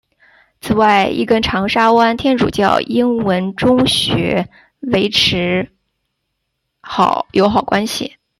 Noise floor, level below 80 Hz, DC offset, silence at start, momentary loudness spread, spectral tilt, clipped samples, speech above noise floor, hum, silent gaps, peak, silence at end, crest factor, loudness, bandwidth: -72 dBFS; -42 dBFS; under 0.1%; 0.65 s; 9 LU; -5 dB/octave; under 0.1%; 58 dB; none; none; -2 dBFS; 0.3 s; 14 dB; -14 LUFS; 14 kHz